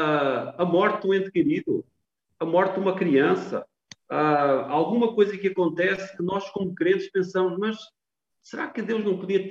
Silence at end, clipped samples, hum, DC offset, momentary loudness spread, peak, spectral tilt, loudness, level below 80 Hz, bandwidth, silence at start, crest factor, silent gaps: 0 s; under 0.1%; none; under 0.1%; 10 LU; -8 dBFS; -7 dB/octave; -24 LUFS; -70 dBFS; 7.6 kHz; 0 s; 16 dB; none